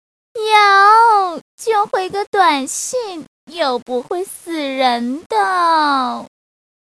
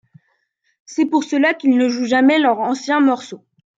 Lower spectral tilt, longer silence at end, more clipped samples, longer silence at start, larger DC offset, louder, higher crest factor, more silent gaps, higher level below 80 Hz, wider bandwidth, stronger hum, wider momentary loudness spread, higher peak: second, -1.5 dB/octave vs -4 dB/octave; first, 0.55 s vs 0.4 s; neither; second, 0.35 s vs 0.9 s; neither; about the same, -15 LUFS vs -16 LUFS; about the same, 16 dB vs 14 dB; first, 1.41-1.58 s, 2.27-2.33 s, 3.28-3.47 s, 3.82-3.86 s, 5.26-5.30 s vs none; first, -66 dBFS vs -74 dBFS; first, 14 kHz vs 7.8 kHz; neither; first, 16 LU vs 9 LU; first, 0 dBFS vs -4 dBFS